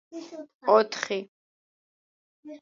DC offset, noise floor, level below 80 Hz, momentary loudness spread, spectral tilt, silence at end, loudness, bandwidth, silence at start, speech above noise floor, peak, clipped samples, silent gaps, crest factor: under 0.1%; under -90 dBFS; -84 dBFS; 21 LU; -3.5 dB/octave; 0.05 s; -25 LUFS; 7.6 kHz; 0.1 s; over 64 dB; -8 dBFS; under 0.1%; 0.54-0.60 s, 1.28-2.43 s; 22 dB